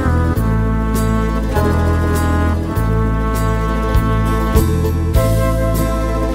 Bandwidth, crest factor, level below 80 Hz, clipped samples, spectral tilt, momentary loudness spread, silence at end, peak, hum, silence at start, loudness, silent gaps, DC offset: 16 kHz; 14 dB; -20 dBFS; under 0.1%; -7 dB/octave; 2 LU; 0 s; 0 dBFS; none; 0 s; -16 LUFS; none; under 0.1%